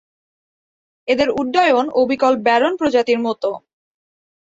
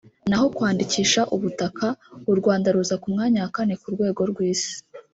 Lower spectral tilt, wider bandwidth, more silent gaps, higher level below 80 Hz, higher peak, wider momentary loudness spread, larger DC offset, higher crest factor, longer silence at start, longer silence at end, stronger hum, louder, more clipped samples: about the same, -4.5 dB/octave vs -4.5 dB/octave; about the same, 7.8 kHz vs 8 kHz; neither; about the same, -58 dBFS vs -58 dBFS; first, -2 dBFS vs -6 dBFS; about the same, 9 LU vs 7 LU; neither; about the same, 16 dB vs 16 dB; first, 1.05 s vs 0.25 s; first, 1 s vs 0.15 s; neither; first, -17 LUFS vs -23 LUFS; neither